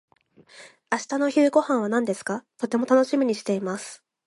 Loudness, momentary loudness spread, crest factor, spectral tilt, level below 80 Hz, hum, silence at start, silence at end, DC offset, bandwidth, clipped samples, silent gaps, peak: -24 LUFS; 11 LU; 18 dB; -5 dB/octave; -74 dBFS; none; 0.55 s; 0.3 s; under 0.1%; 11.5 kHz; under 0.1%; none; -6 dBFS